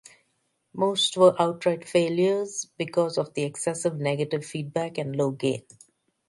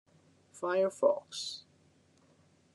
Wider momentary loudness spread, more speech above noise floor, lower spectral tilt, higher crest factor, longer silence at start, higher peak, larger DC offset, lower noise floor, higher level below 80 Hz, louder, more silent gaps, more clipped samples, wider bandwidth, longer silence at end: about the same, 11 LU vs 12 LU; first, 48 dB vs 35 dB; about the same, -4.5 dB/octave vs -3.5 dB/octave; about the same, 20 dB vs 22 dB; first, 0.75 s vs 0.55 s; first, -6 dBFS vs -14 dBFS; neither; first, -73 dBFS vs -67 dBFS; first, -72 dBFS vs -86 dBFS; first, -25 LUFS vs -33 LUFS; neither; neither; about the same, 11.5 kHz vs 11.5 kHz; second, 0.7 s vs 1.15 s